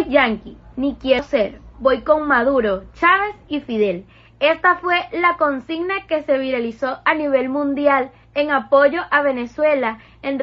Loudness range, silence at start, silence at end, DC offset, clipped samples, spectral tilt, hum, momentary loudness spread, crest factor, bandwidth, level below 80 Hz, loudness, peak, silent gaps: 2 LU; 0 s; 0 s; under 0.1%; under 0.1%; -2 dB/octave; none; 9 LU; 16 dB; 6.4 kHz; -48 dBFS; -18 LUFS; -2 dBFS; none